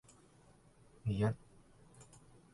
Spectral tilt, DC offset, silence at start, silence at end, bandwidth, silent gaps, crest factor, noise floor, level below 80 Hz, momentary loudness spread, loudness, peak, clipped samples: -7.5 dB/octave; under 0.1%; 1.05 s; 0.5 s; 11.5 kHz; none; 20 dB; -65 dBFS; -62 dBFS; 25 LU; -39 LUFS; -22 dBFS; under 0.1%